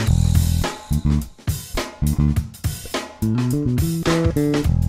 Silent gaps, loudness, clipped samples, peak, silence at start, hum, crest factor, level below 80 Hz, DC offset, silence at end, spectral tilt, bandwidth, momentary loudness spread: none; -21 LUFS; under 0.1%; -4 dBFS; 0 s; none; 16 dB; -26 dBFS; under 0.1%; 0 s; -6 dB/octave; 16.5 kHz; 9 LU